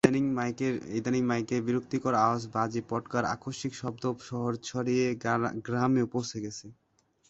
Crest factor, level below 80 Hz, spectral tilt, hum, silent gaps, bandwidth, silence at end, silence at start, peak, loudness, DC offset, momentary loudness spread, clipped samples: 24 dB; -64 dBFS; -6 dB/octave; none; none; 11 kHz; 0.55 s; 0.05 s; -6 dBFS; -30 LUFS; under 0.1%; 8 LU; under 0.1%